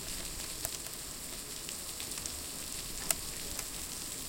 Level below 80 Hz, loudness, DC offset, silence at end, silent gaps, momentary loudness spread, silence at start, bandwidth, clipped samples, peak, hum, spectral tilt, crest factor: -52 dBFS; -38 LUFS; under 0.1%; 0 s; none; 6 LU; 0 s; 17 kHz; under 0.1%; -8 dBFS; none; -1 dB/octave; 32 dB